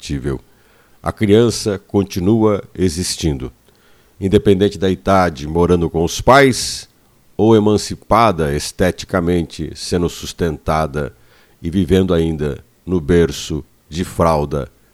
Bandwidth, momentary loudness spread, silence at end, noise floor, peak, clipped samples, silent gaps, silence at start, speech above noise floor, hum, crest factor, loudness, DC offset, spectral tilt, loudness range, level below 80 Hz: 15.5 kHz; 13 LU; 0.3 s; -52 dBFS; 0 dBFS; under 0.1%; none; 0 s; 36 dB; none; 16 dB; -16 LUFS; under 0.1%; -5.5 dB/octave; 5 LU; -34 dBFS